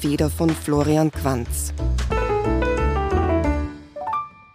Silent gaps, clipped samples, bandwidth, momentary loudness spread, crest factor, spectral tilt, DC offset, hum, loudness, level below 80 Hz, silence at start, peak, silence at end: none; under 0.1%; 15.5 kHz; 7 LU; 16 dB; -6 dB/octave; under 0.1%; none; -22 LUFS; -28 dBFS; 0 s; -6 dBFS; 0.25 s